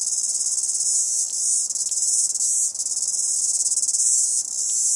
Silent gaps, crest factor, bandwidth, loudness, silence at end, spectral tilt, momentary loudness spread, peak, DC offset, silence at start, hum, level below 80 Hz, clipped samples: none; 18 dB; 11.5 kHz; -19 LUFS; 0 s; 3.5 dB/octave; 4 LU; -6 dBFS; under 0.1%; 0 s; none; -76 dBFS; under 0.1%